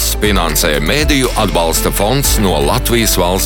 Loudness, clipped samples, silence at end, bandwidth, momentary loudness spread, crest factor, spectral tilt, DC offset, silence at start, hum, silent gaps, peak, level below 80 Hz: -12 LUFS; under 0.1%; 0 s; 17.5 kHz; 2 LU; 12 dB; -3.5 dB/octave; under 0.1%; 0 s; none; none; 0 dBFS; -20 dBFS